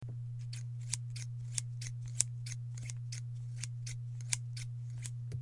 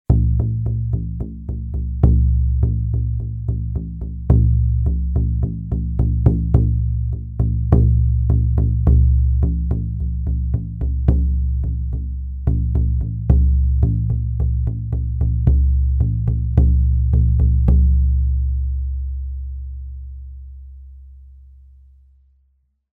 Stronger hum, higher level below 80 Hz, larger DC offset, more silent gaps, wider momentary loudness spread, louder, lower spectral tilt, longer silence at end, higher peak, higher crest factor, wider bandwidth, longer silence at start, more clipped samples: neither; second, -62 dBFS vs -20 dBFS; neither; neither; second, 8 LU vs 12 LU; second, -40 LUFS vs -19 LUFS; second, -3 dB/octave vs -13 dB/octave; second, 0 s vs 1.65 s; second, -6 dBFS vs 0 dBFS; first, 36 dB vs 16 dB; first, 11.5 kHz vs 1.5 kHz; about the same, 0 s vs 0.1 s; neither